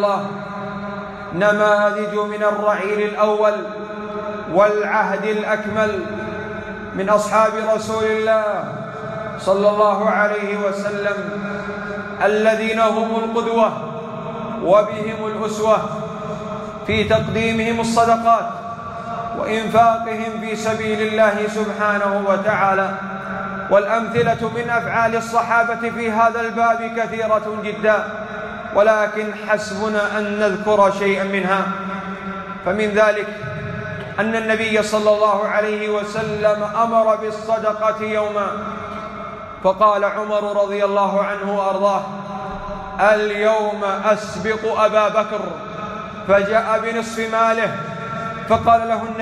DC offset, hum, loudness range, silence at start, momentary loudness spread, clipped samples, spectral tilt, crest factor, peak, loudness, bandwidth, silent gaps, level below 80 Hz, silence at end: under 0.1%; none; 2 LU; 0 s; 12 LU; under 0.1%; -5.5 dB/octave; 16 dB; -4 dBFS; -19 LUFS; 12.5 kHz; none; -50 dBFS; 0 s